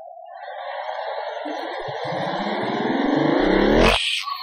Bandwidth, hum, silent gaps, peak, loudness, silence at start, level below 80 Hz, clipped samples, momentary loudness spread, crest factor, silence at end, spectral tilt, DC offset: 15.5 kHz; none; none; -4 dBFS; -22 LUFS; 0 s; -36 dBFS; under 0.1%; 15 LU; 18 dB; 0 s; -5 dB/octave; under 0.1%